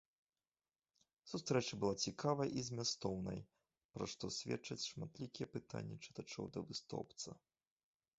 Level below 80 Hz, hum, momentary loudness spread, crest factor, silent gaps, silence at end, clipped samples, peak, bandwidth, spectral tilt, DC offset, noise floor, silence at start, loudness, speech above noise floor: -72 dBFS; none; 12 LU; 22 dB; 3.85-3.89 s; 0.85 s; under 0.1%; -24 dBFS; 8 kHz; -5 dB/octave; under 0.1%; under -90 dBFS; 1.25 s; -44 LUFS; over 46 dB